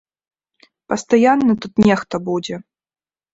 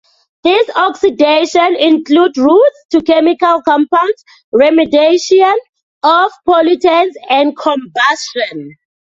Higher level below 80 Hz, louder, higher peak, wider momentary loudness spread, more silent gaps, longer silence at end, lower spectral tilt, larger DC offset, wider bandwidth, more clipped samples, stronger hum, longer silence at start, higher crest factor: about the same, -52 dBFS vs -54 dBFS; second, -17 LUFS vs -11 LUFS; about the same, -2 dBFS vs 0 dBFS; first, 12 LU vs 8 LU; second, none vs 2.85-2.89 s, 4.44-4.52 s, 5.69-5.73 s, 5.83-6.01 s; first, 0.75 s vs 0.35 s; first, -6 dB/octave vs -3 dB/octave; neither; about the same, 8 kHz vs 7.8 kHz; neither; neither; first, 0.9 s vs 0.45 s; first, 18 dB vs 10 dB